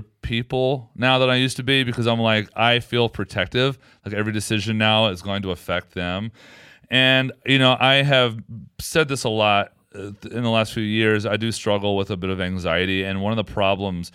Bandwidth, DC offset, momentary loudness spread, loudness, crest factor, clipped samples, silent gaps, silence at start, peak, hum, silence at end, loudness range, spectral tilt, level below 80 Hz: 15 kHz; under 0.1%; 11 LU; -20 LUFS; 18 dB; under 0.1%; none; 0 s; -2 dBFS; none; 0.05 s; 4 LU; -5 dB/octave; -50 dBFS